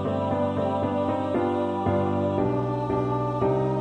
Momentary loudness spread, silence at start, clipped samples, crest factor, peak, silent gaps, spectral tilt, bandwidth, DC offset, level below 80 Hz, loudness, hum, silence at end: 2 LU; 0 s; under 0.1%; 14 dB; -10 dBFS; none; -9 dB/octave; 9 kHz; under 0.1%; -50 dBFS; -25 LUFS; none; 0 s